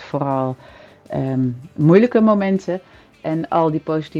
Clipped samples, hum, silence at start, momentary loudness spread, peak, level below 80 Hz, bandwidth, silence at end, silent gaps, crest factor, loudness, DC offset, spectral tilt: under 0.1%; none; 0 s; 15 LU; 0 dBFS; -56 dBFS; 7.6 kHz; 0 s; none; 18 dB; -18 LUFS; under 0.1%; -9 dB/octave